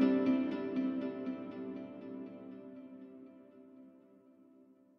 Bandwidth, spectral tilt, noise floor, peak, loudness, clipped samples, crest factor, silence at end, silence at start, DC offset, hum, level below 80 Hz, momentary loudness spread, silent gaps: 5.6 kHz; -8.5 dB/octave; -63 dBFS; -18 dBFS; -37 LUFS; under 0.1%; 20 dB; 1 s; 0 s; under 0.1%; none; -82 dBFS; 25 LU; none